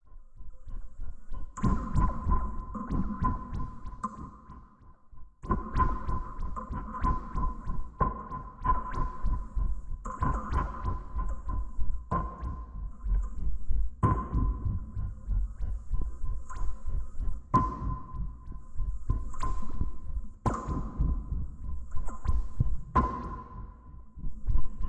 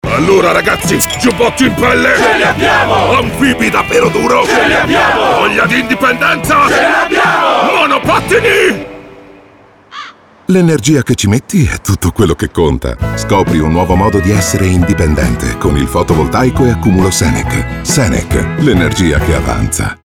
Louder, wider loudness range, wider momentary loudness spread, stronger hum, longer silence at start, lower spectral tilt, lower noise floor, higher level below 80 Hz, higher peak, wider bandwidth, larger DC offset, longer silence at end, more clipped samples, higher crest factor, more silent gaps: second, -35 LUFS vs -10 LUFS; about the same, 3 LU vs 3 LU; first, 16 LU vs 6 LU; neither; about the same, 0.1 s vs 0.05 s; first, -8.5 dB/octave vs -5 dB/octave; first, -54 dBFS vs -41 dBFS; second, -34 dBFS vs -24 dBFS; second, -14 dBFS vs 0 dBFS; second, 8 kHz vs 19.5 kHz; neither; about the same, 0 s vs 0.1 s; neither; first, 16 dB vs 10 dB; neither